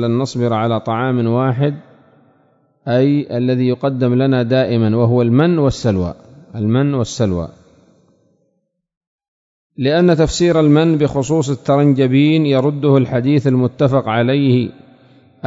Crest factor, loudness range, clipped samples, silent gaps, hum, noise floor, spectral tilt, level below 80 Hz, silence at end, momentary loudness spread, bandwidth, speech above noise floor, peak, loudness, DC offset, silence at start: 16 dB; 8 LU; under 0.1%; 8.97-9.01 s, 9.07-9.19 s, 9.28-9.70 s; none; -68 dBFS; -7.5 dB/octave; -42 dBFS; 0 s; 6 LU; 8 kHz; 54 dB; 0 dBFS; -15 LUFS; under 0.1%; 0 s